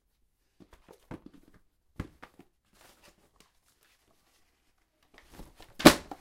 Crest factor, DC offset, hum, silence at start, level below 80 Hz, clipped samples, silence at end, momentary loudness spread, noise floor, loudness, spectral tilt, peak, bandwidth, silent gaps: 32 dB; under 0.1%; none; 2 s; -54 dBFS; under 0.1%; 0.2 s; 28 LU; -73 dBFS; -21 LUFS; -4 dB/octave; -2 dBFS; 16 kHz; none